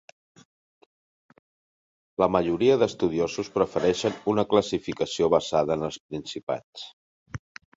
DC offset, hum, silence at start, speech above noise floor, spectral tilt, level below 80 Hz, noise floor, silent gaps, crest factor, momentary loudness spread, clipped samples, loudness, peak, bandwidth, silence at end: under 0.1%; none; 2.2 s; over 65 dB; -5.5 dB/octave; -56 dBFS; under -90 dBFS; 6.00-6.09 s, 6.43-6.47 s, 6.64-6.73 s, 6.93-7.26 s; 20 dB; 19 LU; under 0.1%; -25 LUFS; -6 dBFS; 8 kHz; 0.4 s